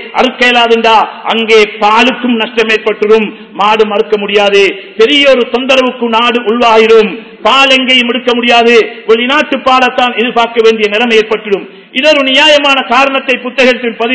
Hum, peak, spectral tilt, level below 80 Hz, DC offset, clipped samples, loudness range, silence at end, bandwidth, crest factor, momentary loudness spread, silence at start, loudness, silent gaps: none; 0 dBFS; -3 dB/octave; -50 dBFS; 0.3%; 5%; 2 LU; 0 s; 8 kHz; 8 dB; 7 LU; 0 s; -7 LUFS; none